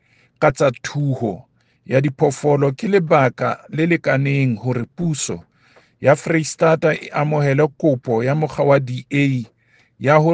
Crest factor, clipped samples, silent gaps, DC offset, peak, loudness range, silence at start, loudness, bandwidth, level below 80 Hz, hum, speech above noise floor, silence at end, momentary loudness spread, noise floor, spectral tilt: 18 dB; under 0.1%; none; under 0.1%; 0 dBFS; 2 LU; 0.4 s; -18 LUFS; 9.8 kHz; -56 dBFS; none; 37 dB; 0 s; 8 LU; -54 dBFS; -6.5 dB/octave